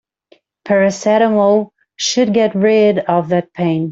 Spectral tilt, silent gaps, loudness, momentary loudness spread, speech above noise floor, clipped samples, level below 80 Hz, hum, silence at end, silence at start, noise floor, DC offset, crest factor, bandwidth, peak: -5 dB/octave; none; -14 LUFS; 6 LU; 40 dB; under 0.1%; -58 dBFS; none; 0 s; 0.65 s; -53 dBFS; under 0.1%; 14 dB; 7.8 kHz; -2 dBFS